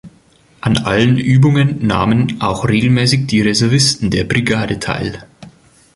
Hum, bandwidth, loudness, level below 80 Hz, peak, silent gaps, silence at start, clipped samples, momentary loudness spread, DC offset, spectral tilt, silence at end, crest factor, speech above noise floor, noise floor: none; 11.5 kHz; -14 LUFS; -38 dBFS; 0 dBFS; none; 0.05 s; under 0.1%; 8 LU; under 0.1%; -5.5 dB/octave; 0.5 s; 14 dB; 36 dB; -50 dBFS